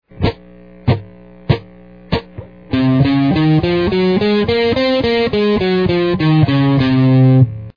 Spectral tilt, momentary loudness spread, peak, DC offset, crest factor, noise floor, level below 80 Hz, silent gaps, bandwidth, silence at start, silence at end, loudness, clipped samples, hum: -9 dB/octave; 10 LU; 0 dBFS; 0.3%; 14 dB; -40 dBFS; -36 dBFS; none; 5.2 kHz; 0.15 s; 0.05 s; -14 LUFS; under 0.1%; none